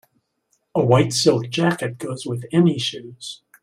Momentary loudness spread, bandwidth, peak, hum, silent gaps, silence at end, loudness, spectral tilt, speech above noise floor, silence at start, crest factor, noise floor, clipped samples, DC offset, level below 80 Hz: 17 LU; 15 kHz; -2 dBFS; none; none; 0.3 s; -20 LUFS; -5.5 dB/octave; 49 dB; 0.75 s; 20 dB; -69 dBFS; under 0.1%; under 0.1%; -56 dBFS